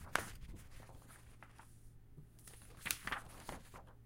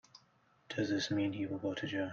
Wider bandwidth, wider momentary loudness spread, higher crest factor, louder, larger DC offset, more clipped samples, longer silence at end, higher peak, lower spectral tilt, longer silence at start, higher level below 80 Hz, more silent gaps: first, 16.5 kHz vs 7.6 kHz; first, 20 LU vs 5 LU; first, 38 dB vs 16 dB; second, -46 LUFS vs -37 LUFS; neither; neither; about the same, 0 s vs 0 s; first, -12 dBFS vs -22 dBFS; second, -2 dB/octave vs -5 dB/octave; second, 0 s vs 0.15 s; first, -60 dBFS vs -72 dBFS; neither